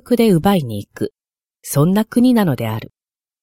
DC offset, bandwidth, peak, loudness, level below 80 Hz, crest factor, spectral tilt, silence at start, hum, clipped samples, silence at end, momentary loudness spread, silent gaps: under 0.1%; 16.5 kHz; -2 dBFS; -16 LUFS; -48 dBFS; 14 dB; -6.5 dB/octave; 0.1 s; none; under 0.1%; 0.55 s; 14 LU; none